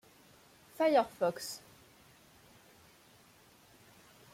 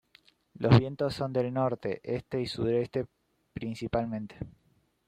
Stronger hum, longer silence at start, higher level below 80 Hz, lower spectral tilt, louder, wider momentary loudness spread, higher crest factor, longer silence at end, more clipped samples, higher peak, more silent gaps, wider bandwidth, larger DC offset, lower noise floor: neither; first, 0.8 s vs 0.6 s; second, -76 dBFS vs -56 dBFS; second, -4 dB/octave vs -8 dB/octave; about the same, -32 LUFS vs -30 LUFS; about the same, 19 LU vs 19 LU; about the same, 22 dB vs 22 dB; first, 2.75 s vs 0.6 s; neither; second, -16 dBFS vs -8 dBFS; neither; first, 16.5 kHz vs 10 kHz; neither; about the same, -62 dBFS vs -63 dBFS